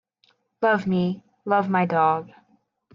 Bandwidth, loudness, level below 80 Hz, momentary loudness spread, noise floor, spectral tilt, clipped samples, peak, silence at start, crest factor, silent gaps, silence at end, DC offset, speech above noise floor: 6.2 kHz; -23 LUFS; -68 dBFS; 8 LU; -66 dBFS; -8.5 dB/octave; under 0.1%; -8 dBFS; 0.6 s; 16 dB; none; 0.65 s; under 0.1%; 44 dB